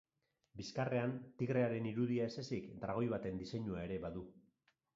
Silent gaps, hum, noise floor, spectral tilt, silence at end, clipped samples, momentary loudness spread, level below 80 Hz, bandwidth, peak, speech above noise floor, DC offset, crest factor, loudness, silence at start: none; none; -81 dBFS; -6.5 dB/octave; 0.55 s; under 0.1%; 11 LU; -66 dBFS; 7.4 kHz; -24 dBFS; 41 dB; under 0.1%; 18 dB; -41 LUFS; 0.55 s